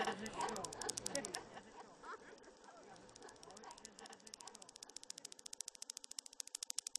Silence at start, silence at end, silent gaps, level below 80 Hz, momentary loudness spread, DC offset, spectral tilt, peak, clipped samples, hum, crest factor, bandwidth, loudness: 0 s; 0 s; none; -76 dBFS; 16 LU; under 0.1%; -1 dB/octave; -18 dBFS; under 0.1%; none; 32 dB; 13 kHz; -48 LUFS